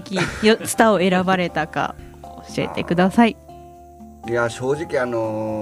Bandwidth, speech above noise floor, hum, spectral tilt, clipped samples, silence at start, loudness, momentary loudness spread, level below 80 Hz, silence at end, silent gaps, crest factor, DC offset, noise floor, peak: 15.5 kHz; 23 dB; none; -5 dB/octave; under 0.1%; 0 s; -20 LUFS; 16 LU; -46 dBFS; 0 s; none; 18 dB; under 0.1%; -42 dBFS; -2 dBFS